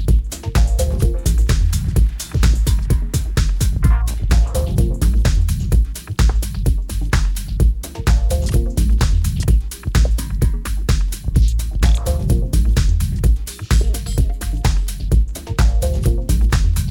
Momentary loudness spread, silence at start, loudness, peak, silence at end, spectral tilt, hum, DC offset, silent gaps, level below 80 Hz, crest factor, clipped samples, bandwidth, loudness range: 4 LU; 0 s; -19 LUFS; 0 dBFS; 0 s; -5.5 dB/octave; none; under 0.1%; none; -16 dBFS; 14 dB; under 0.1%; 17 kHz; 1 LU